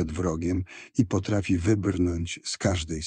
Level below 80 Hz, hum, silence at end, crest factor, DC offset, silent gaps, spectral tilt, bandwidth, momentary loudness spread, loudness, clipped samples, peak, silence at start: -44 dBFS; none; 0 s; 18 dB; under 0.1%; none; -6 dB/octave; 9.8 kHz; 7 LU; -27 LUFS; under 0.1%; -8 dBFS; 0 s